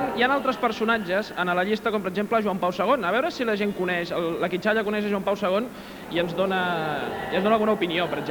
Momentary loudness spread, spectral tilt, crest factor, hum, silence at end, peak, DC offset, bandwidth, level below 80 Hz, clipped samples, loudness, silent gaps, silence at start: 5 LU; -5.5 dB/octave; 18 dB; none; 0 s; -8 dBFS; under 0.1%; over 20 kHz; -56 dBFS; under 0.1%; -24 LUFS; none; 0 s